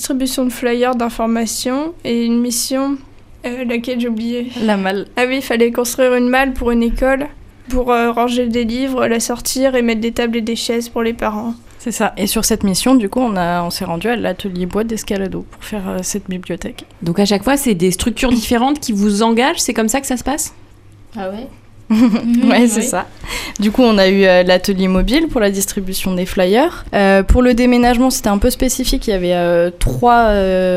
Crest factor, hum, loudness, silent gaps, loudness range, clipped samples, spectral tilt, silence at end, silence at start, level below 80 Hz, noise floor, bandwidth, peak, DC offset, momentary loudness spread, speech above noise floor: 14 dB; none; -15 LUFS; none; 5 LU; under 0.1%; -4.5 dB/octave; 0 s; 0 s; -28 dBFS; -41 dBFS; 15.5 kHz; 0 dBFS; under 0.1%; 12 LU; 26 dB